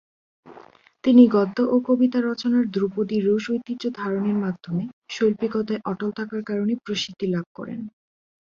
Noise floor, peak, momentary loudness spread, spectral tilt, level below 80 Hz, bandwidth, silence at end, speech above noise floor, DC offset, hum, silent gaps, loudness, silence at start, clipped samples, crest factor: -49 dBFS; -2 dBFS; 12 LU; -6.5 dB/octave; -64 dBFS; 7.2 kHz; 0.6 s; 28 dB; under 0.1%; none; 4.93-5.02 s, 7.46-7.55 s; -23 LUFS; 0.45 s; under 0.1%; 20 dB